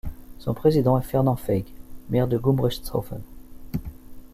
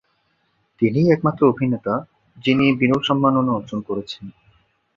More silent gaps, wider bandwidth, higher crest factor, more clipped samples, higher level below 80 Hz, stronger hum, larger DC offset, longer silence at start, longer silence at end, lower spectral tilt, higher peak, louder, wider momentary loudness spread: neither; first, 15.5 kHz vs 7.4 kHz; about the same, 18 dB vs 18 dB; neither; first, -40 dBFS vs -54 dBFS; neither; neither; second, 0.05 s vs 0.8 s; second, 0.1 s vs 0.65 s; about the same, -8 dB/octave vs -8 dB/octave; second, -6 dBFS vs -2 dBFS; second, -24 LUFS vs -19 LUFS; first, 18 LU vs 11 LU